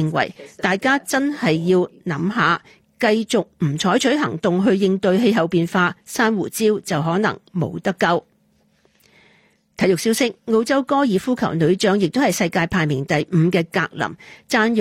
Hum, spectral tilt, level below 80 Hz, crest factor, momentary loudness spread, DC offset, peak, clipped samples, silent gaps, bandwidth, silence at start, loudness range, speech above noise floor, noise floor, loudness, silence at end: none; -5.5 dB/octave; -56 dBFS; 14 dB; 6 LU; under 0.1%; -4 dBFS; under 0.1%; none; 16 kHz; 0 s; 4 LU; 42 dB; -61 dBFS; -19 LUFS; 0 s